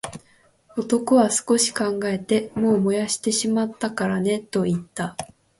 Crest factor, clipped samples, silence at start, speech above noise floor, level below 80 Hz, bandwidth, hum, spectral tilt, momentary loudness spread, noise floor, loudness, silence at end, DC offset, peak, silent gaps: 16 dB; under 0.1%; 0.05 s; 36 dB; -60 dBFS; 12 kHz; none; -4.5 dB/octave; 12 LU; -58 dBFS; -22 LUFS; 0.35 s; under 0.1%; -6 dBFS; none